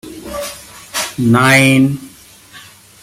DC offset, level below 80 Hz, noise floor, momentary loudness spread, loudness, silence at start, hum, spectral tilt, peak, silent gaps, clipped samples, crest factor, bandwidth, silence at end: under 0.1%; -48 dBFS; -40 dBFS; 19 LU; -12 LUFS; 0.05 s; none; -4.5 dB/octave; 0 dBFS; none; under 0.1%; 16 dB; 16 kHz; 0.4 s